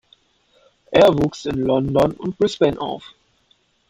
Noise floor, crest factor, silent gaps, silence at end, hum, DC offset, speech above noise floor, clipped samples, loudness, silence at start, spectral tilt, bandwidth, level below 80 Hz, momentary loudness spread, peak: -61 dBFS; 18 dB; none; 0.85 s; none; under 0.1%; 44 dB; under 0.1%; -19 LUFS; 0.9 s; -6.5 dB/octave; 15 kHz; -46 dBFS; 12 LU; -2 dBFS